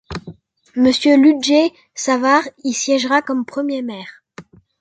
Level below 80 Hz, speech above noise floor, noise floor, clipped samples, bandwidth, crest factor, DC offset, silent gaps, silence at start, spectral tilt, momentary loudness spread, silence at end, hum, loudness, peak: -52 dBFS; 26 dB; -42 dBFS; under 0.1%; 9.2 kHz; 14 dB; under 0.1%; none; 0.1 s; -3 dB/octave; 17 LU; 0.4 s; none; -16 LUFS; -2 dBFS